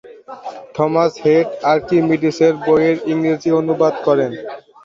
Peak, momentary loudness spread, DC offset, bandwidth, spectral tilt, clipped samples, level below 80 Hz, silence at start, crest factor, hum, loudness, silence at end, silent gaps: -2 dBFS; 17 LU; under 0.1%; 7.4 kHz; -7 dB/octave; under 0.1%; -56 dBFS; 0.05 s; 14 dB; none; -16 LUFS; 0.25 s; none